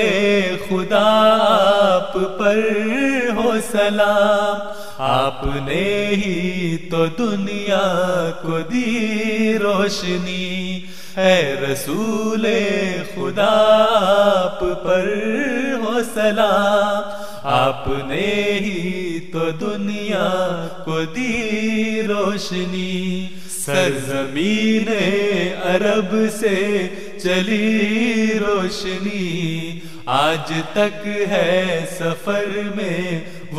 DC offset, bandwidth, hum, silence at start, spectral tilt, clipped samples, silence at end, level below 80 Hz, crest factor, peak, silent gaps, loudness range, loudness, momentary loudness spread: 3%; 15 kHz; none; 0 s; -5 dB/octave; under 0.1%; 0 s; -44 dBFS; 16 dB; -2 dBFS; none; 4 LU; -19 LUFS; 9 LU